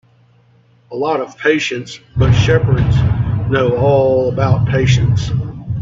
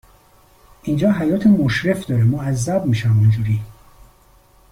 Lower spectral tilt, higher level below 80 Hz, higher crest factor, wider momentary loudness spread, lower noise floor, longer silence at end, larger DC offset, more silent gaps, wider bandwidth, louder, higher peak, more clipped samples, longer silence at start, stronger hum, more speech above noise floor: about the same, -7 dB/octave vs -7 dB/octave; first, -30 dBFS vs -44 dBFS; about the same, 14 dB vs 14 dB; about the same, 9 LU vs 9 LU; about the same, -50 dBFS vs -51 dBFS; second, 0 s vs 1 s; neither; neither; second, 7.6 kHz vs 15.5 kHz; first, -14 LUFS vs -18 LUFS; first, 0 dBFS vs -4 dBFS; neither; about the same, 0.9 s vs 0.85 s; neither; about the same, 37 dB vs 35 dB